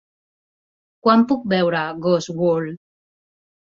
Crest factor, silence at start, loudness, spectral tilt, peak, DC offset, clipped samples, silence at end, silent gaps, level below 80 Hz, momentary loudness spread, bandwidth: 20 dB; 1.05 s; -19 LUFS; -6.5 dB/octave; -2 dBFS; under 0.1%; under 0.1%; 0.95 s; none; -64 dBFS; 6 LU; 7.4 kHz